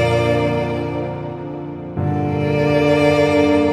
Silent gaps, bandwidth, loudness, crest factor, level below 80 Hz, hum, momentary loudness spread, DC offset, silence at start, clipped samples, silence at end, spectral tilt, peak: none; 12.5 kHz; -18 LUFS; 16 dB; -48 dBFS; none; 13 LU; under 0.1%; 0 s; under 0.1%; 0 s; -7 dB/octave; -2 dBFS